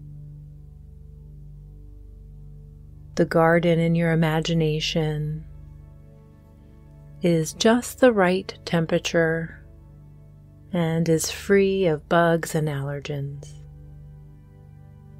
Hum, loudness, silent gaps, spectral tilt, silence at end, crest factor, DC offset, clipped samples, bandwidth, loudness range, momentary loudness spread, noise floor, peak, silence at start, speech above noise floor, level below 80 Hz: 50 Hz at -50 dBFS; -22 LUFS; none; -5.5 dB/octave; 0.2 s; 20 dB; under 0.1%; under 0.1%; 16 kHz; 4 LU; 25 LU; -48 dBFS; -4 dBFS; 0 s; 27 dB; -46 dBFS